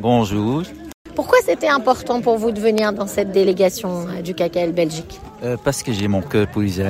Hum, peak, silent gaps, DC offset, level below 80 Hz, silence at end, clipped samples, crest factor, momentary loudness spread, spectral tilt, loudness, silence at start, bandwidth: none; -2 dBFS; 0.94-1.05 s; under 0.1%; -46 dBFS; 0 s; under 0.1%; 16 dB; 10 LU; -5.5 dB/octave; -19 LUFS; 0 s; 16 kHz